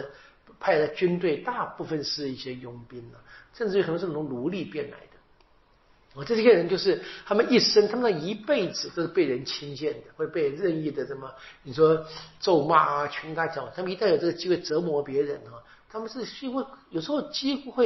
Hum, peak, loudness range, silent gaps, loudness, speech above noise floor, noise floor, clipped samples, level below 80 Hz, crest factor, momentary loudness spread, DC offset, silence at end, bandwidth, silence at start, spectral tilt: none; -6 dBFS; 7 LU; none; -26 LUFS; 34 dB; -61 dBFS; under 0.1%; -62 dBFS; 22 dB; 17 LU; under 0.1%; 0 s; 6.2 kHz; 0 s; -3.5 dB/octave